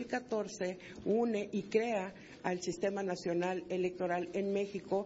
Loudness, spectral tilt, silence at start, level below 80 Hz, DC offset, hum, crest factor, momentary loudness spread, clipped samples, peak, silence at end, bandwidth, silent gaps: -36 LUFS; -5 dB/octave; 0 s; -70 dBFS; under 0.1%; none; 18 dB; 6 LU; under 0.1%; -18 dBFS; 0 s; 7.6 kHz; none